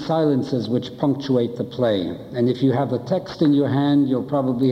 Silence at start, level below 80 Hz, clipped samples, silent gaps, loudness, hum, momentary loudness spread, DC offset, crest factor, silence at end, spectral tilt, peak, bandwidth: 0 s; -58 dBFS; under 0.1%; none; -21 LUFS; none; 6 LU; under 0.1%; 12 dB; 0 s; -8.5 dB/octave; -8 dBFS; 6.6 kHz